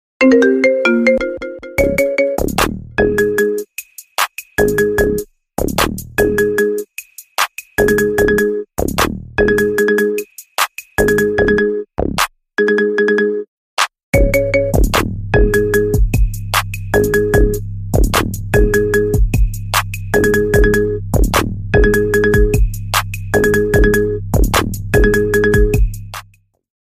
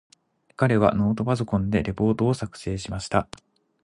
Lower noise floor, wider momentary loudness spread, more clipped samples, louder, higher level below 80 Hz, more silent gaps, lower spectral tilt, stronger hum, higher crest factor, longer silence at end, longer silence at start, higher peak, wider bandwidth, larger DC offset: about the same, -49 dBFS vs -49 dBFS; second, 7 LU vs 11 LU; neither; first, -15 LUFS vs -24 LUFS; first, -22 dBFS vs -44 dBFS; first, 13.48-13.77 s, 14.03-14.13 s vs none; second, -5 dB/octave vs -7 dB/octave; neither; second, 14 dB vs 20 dB; about the same, 0.7 s vs 0.6 s; second, 0.2 s vs 0.6 s; first, 0 dBFS vs -6 dBFS; first, 16 kHz vs 11 kHz; neither